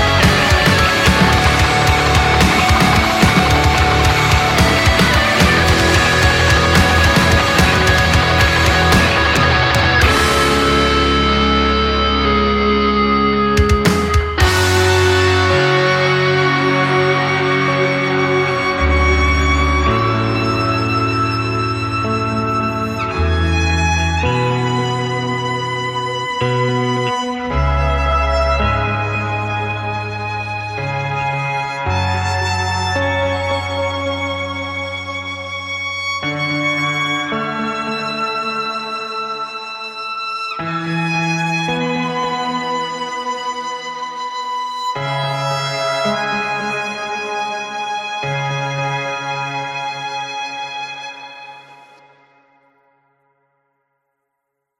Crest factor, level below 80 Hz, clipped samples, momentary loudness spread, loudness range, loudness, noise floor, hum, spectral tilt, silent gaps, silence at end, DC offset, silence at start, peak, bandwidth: 16 dB; -26 dBFS; under 0.1%; 11 LU; 10 LU; -15 LUFS; -75 dBFS; none; -4.5 dB/octave; none; 3.05 s; under 0.1%; 0 s; 0 dBFS; 16.5 kHz